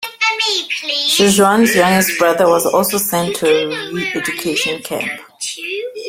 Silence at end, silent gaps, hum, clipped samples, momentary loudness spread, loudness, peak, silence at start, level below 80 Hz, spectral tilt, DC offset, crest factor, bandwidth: 0 s; none; none; under 0.1%; 11 LU; -15 LUFS; 0 dBFS; 0 s; -54 dBFS; -3 dB/octave; under 0.1%; 14 dB; 16.5 kHz